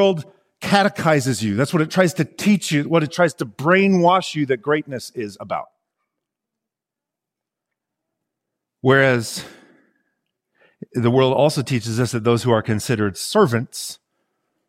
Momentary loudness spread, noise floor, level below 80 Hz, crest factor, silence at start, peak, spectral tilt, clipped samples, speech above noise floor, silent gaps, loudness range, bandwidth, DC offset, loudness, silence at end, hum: 13 LU; -86 dBFS; -60 dBFS; 18 dB; 0 s; -2 dBFS; -5.5 dB/octave; under 0.1%; 68 dB; none; 10 LU; 16 kHz; under 0.1%; -19 LUFS; 0.75 s; none